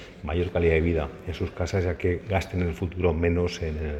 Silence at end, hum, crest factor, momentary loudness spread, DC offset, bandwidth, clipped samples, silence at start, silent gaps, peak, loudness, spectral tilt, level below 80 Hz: 0 s; none; 18 dB; 8 LU; under 0.1%; 8.4 kHz; under 0.1%; 0 s; none; -8 dBFS; -27 LUFS; -7 dB/octave; -36 dBFS